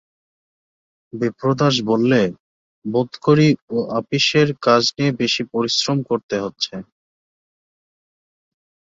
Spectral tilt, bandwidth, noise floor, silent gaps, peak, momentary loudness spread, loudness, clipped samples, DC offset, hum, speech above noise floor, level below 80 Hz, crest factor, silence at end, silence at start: -5 dB/octave; 7.8 kHz; under -90 dBFS; 2.40-2.82 s, 3.62-3.68 s, 6.23-6.29 s; -2 dBFS; 10 LU; -18 LUFS; under 0.1%; under 0.1%; none; over 72 dB; -60 dBFS; 18 dB; 2.15 s; 1.15 s